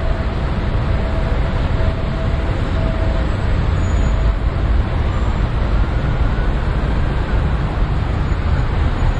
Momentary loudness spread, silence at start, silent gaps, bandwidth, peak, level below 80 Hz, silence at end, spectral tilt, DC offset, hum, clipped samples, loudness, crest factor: 2 LU; 0 s; none; 8.2 kHz; -4 dBFS; -18 dBFS; 0 s; -7.5 dB/octave; under 0.1%; none; under 0.1%; -19 LUFS; 12 dB